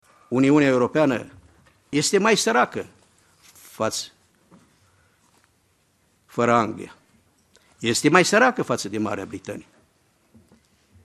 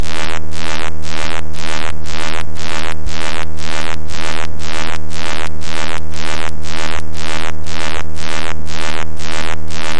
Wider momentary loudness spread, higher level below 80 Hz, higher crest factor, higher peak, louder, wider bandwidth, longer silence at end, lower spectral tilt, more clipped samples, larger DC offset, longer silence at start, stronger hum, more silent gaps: first, 20 LU vs 2 LU; second, -64 dBFS vs -34 dBFS; about the same, 24 dB vs 20 dB; about the same, 0 dBFS vs 0 dBFS; about the same, -21 LUFS vs -23 LUFS; first, 13 kHz vs 11.5 kHz; first, 1.45 s vs 0 s; about the same, -4 dB/octave vs -3.5 dB/octave; neither; second, under 0.1% vs 60%; first, 0.3 s vs 0 s; neither; neither